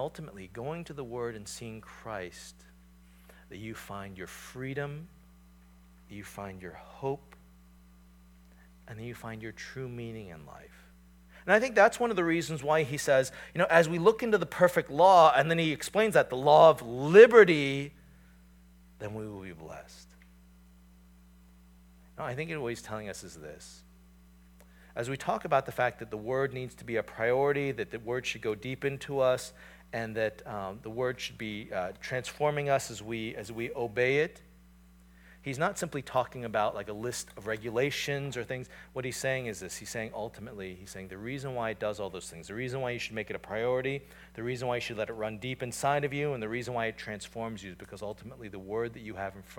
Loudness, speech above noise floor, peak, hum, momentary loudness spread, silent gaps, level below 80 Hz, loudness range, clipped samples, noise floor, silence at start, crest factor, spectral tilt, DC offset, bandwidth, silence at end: -29 LUFS; 27 dB; -4 dBFS; none; 20 LU; none; -60 dBFS; 20 LU; under 0.1%; -57 dBFS; 0 s; 26 dB; -5 dB/octave; under 0.1%; 18 kHz; 0 s